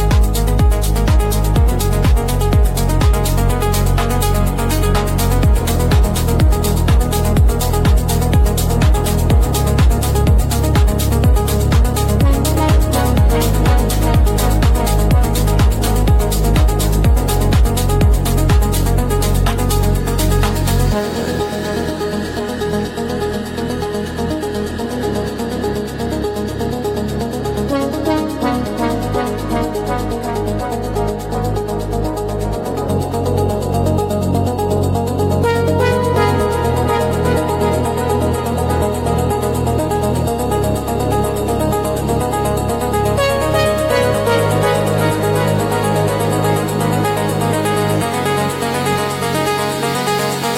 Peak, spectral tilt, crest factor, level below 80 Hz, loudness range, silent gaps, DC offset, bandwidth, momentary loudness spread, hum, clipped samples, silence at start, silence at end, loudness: -2 dBFS; -6 dB/octave; 12 dB; -18 dBFS; 6 LU; none; under 0.1%; 16.5 kHz; 6 LU; none; under 0.1%; 0 s; 0 s; -16 LUFS